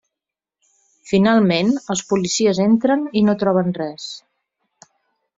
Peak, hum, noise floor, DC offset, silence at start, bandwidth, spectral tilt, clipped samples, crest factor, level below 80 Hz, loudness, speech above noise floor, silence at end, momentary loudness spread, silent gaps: -2 dBFS; none; -86 dBFS; under 0.1%; 1.05 s; 7.8 kHz; -5 dB/octave; under 0.1%; 16 dB; -60 dBFS; -18 LUFS; 69 dB; 1.2 s; 12 LU; none